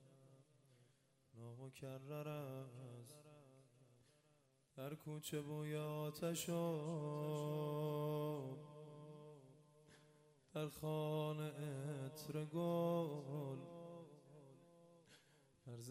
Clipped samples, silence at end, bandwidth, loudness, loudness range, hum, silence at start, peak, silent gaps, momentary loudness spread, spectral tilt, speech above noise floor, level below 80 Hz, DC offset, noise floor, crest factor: under 0.1%; 0 s; 15 kHz; -46 LUFS; 10 LU; none; 0 s; -32 dBFS; none; 21 LU; -6.5 dB/octave; 32 dB; -84 dBFS; under 0.1%; -77 dBFS; 16 dB